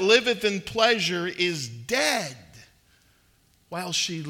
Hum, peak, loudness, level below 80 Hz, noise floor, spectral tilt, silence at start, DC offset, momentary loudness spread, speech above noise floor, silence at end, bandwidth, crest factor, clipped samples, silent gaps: none; -6 dBFS; -24 LUFS; -62 dBFS; -62 dBFS; -3 dB/octave; 0 s; under 0.1%; 13 LU; 38 dB; 0 s; 17 kHz; 22 dB; under 0.1%; none